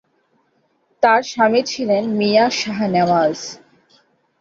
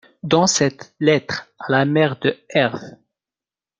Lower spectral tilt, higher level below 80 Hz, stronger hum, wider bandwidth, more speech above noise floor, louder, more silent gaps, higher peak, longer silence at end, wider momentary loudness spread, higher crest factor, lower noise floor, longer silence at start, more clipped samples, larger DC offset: about the same, -4.5 dB/octave vs -4 dB/octave; about the same, -62 dBFS vs -60 dBFS; neither; second, 7.8 kHz vs 9.6 kHz; second, 47 dB vs over 71 dB; about the same, -17 LUFS vs -19 LUFS; neither; about the same, -2 dBFS vs -2 dBFS; about the same, 0.85 s vs 0.9 s; second, 5 LU vs 8 LU; about the same, 18 dB vs 18 dB; second, -63 dBFS vs under -90 dBFS; first, 1 s vs 0.25 s; neither; neither